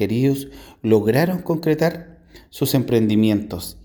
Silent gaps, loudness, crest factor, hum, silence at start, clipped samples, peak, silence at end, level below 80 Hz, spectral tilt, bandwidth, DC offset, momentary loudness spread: none; -20 LUFS; 16 dB; none; 0 s; under 0.1%; -4 dBFS; 0.1 s; -50 dBFS; -6.5 dB/octave; over 20 kHz; under 0.1%; 13 LU